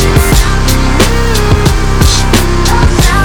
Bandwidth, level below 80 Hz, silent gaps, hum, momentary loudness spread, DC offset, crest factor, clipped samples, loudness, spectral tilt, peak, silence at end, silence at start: over 20 kHz; -10 dBFS; none; none; 2 LU; under 0.1%; 8 dB; 0.7%; -9 LUFS; -4.5 dB/octave; 0 dBFS; 0 s; 0 s